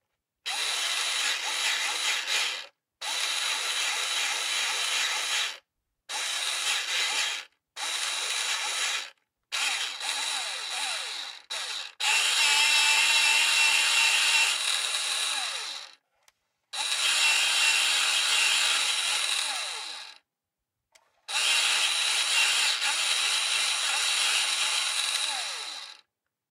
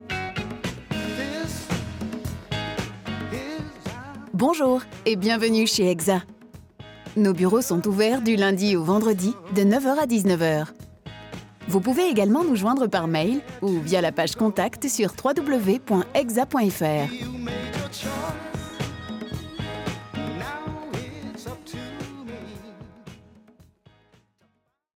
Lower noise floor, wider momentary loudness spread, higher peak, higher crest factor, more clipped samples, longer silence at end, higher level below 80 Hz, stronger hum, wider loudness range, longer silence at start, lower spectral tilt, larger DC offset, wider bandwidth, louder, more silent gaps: first, -87 dBFS vs -70 dBFS; second, 13 LU vs 16 LU; about the same, -8 dBFS vs -10 dBFS; about the same, 20 dB vs 16 dB; neither; second, 0.55 s vs 1.8 s; second, -86 dBFS vs -52 dBFS; neither; second, 7 LU vs 12 LU; first, 0.45 s vs 0 s; second, 5 dB/octave vs -5 dB/octave; neither; second, 16 kHz vs 20 kHz; about the same, -24 LUFS vs -24 LUFS; neither